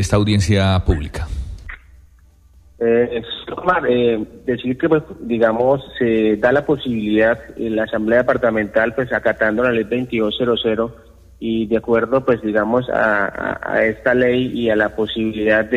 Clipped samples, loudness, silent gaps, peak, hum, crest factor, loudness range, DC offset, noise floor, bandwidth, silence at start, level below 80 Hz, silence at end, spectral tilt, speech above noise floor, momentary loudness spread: under 0.1%; -18 LUFS; none; -4 dBFS; none; 14 dB; 3 LU; under 0.1%; -49 dBFS; 12.5 kHz; 0 s; -36 dBFS; 0 s; -6.5 dB/octave; 32 dB; 8 LU